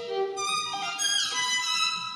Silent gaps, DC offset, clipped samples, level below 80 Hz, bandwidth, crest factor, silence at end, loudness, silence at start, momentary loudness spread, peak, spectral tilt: none; under 0.1%; under 0.1%; -84 dBFS; 15.5 kHz; 16 dB; 0 s; -26 LUFS; 0 s; 6 LU; -14 dBFS; 1 dB/octave